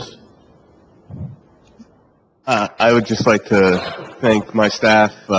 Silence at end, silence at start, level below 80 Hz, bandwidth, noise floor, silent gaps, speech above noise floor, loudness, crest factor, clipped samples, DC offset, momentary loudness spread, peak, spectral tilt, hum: 0 s; 0 s; -48 dBFS; 8 kHz; -55 dBFS; none; 40 dB; -15 LUFS; 18 dB; under 0.1%; under 0.1%; 20 LU; 0 dBFS; -5 dB/octave; none